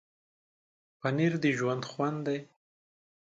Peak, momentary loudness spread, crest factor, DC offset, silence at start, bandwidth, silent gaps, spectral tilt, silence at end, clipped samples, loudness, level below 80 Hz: -16 dBFS; 8 LU; 18 dB; under 0.1%; 1.05 s; 7.8 kHz; none; -6.5 dB/octave; 0.8 s; under 0.1%; -31 LUFS; -76 dBFS